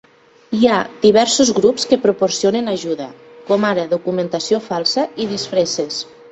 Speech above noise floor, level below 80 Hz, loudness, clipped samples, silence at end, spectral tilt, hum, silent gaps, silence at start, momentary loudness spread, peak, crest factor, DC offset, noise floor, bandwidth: 27 dB; -58 dBFS; -17 LUFS; under 0.1%; 0.25 s; -3.5 dB/octave; none; none; 0.5 s; 10 LU; 0 dBFS; 16 dB; under 0.1%; -44 dBFS; 8.4 kHz